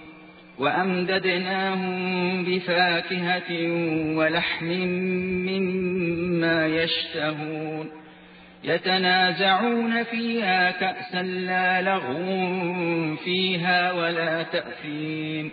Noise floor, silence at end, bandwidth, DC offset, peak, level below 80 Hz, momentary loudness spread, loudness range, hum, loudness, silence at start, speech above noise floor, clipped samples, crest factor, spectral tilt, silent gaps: -48 dBFS; 0 s; 4.9 kHz; under 0.1%; -8 dBFS; -62 dBFS; 8 LU; 2 LU; none; -24 LUFS; 0 s; 24 dB; under 0.1%; 16 dB; -8 dB/octave; none